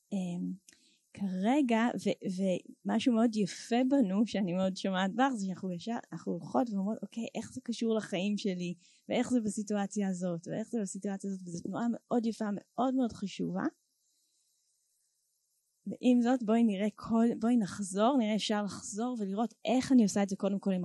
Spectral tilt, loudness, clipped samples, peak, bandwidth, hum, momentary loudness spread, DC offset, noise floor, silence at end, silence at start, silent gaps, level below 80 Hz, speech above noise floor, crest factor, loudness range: -5.5 dB/octave; -32 LUFS; under 0.1%; -16 dBFS; 12 kHz; none; 11 LU; under 0.1%; -78 dBFS; 0 s; 0.1 s; none; -72 dBFS; 47 dB; 16 dB; 5 LU